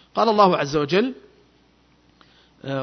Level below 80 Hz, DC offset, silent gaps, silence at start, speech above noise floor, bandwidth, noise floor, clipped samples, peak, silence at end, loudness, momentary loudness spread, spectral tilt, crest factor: -58 dBFS; under 0.1%; none; 0.15 s; 39 dB; 6.4 kHz; -58 dBFS; under 0.1%; -2 dBFS; 0 s; -20 LUFS; 13 LU; -6 dB/octave; 20 dB